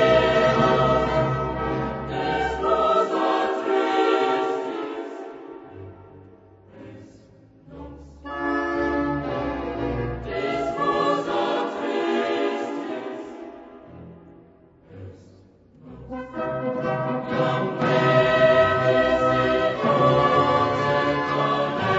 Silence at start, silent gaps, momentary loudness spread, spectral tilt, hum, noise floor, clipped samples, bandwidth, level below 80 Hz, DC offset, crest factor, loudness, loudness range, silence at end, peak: 0 s; none; 22 LU; -6.5 dB/octave; none; -52 dBFS; under 0.1%; 8 kHz; -46 dBFS; under 0.1%; 18 dB; -22 LUFS; 17 LU; 0 s; -6 dBFS